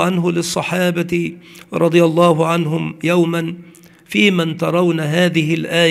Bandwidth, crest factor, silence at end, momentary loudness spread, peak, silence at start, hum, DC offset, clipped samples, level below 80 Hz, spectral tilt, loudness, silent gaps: 15 kHz; 16 dB; 0 s; 8 LU; 0 dBFS; 0 s; none; under 0.1%; under 0.1%; -58 dBFS; -5.5 dB/octave; -16 LUFS; none